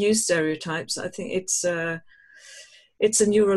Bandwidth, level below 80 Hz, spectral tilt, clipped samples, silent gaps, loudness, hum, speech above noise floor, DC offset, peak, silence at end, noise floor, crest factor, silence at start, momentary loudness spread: 13 kHz; -62 dBFS; -3 dB/octave; under 0.1%; none; -24 LUFS; none; 25 dB; under 0.1%; -8 dBFS; 0 s; -49 dBFS; 16 dB; 0 s; 24 LU